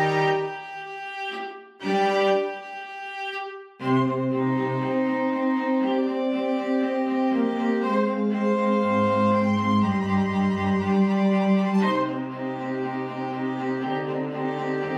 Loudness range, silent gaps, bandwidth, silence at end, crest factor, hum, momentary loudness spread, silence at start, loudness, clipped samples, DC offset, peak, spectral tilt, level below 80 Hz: 5 LU; none; 8.4 kHz; 0 s; 14 dB; none; 11 LU; 0 s; -24 LUFS; under 0.1%; under 0.1%; -10 dBFS; -7.5 dB/octave; -66 dBFS